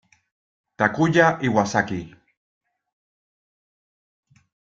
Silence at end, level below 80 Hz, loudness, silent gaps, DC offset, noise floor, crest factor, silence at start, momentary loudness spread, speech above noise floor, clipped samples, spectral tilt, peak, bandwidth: 2.7 s; -60 dBFS; -20 LUFS; none; under 0.1%; under -90 dBFS; 22 dB; 0.8 s; 9 LU; over 70 dB; under 0.1%; -6 dB/octave; -2 dBFS; 7.8 kHz